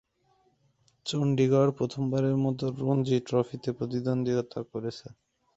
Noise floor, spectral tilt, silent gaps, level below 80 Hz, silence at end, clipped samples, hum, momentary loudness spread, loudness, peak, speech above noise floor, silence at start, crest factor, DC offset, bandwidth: -69 dBFS; -7.5 dB/octave; none; -64 dBFS; 0.5 s; under 0.1%; none; 12 LU; -28 LUFS; -12 dBFS; 41 dB; 1.05 s; 16 dB; under 0.1%; 8.2 kHz